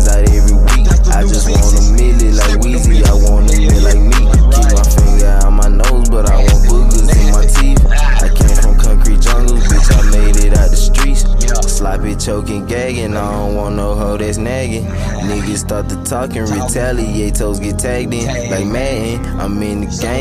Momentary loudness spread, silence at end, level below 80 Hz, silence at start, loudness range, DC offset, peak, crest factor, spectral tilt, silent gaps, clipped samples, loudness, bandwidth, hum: 7 LU; 0 s; -10 dBFS; 0 s; 6 LU; under 0.1%; 0 dBFS; 8 dB; -5 dB/octave; none; under 0.1%; -13 LUFS; 14.5 kHz; none